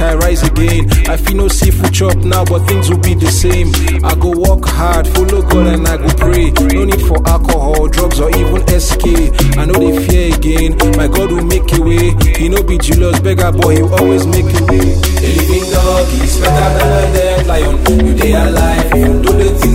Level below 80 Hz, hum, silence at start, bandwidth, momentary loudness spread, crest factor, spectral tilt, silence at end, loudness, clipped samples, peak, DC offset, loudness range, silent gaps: -12 dBFS; none; 0 s; 16.5 kHz; 2 LU; 8 dB; -5.5 dB/octave; 0 s; -11 LUFS; under 0.1%; 0 dBFS; under 0.1%; 1 LU; none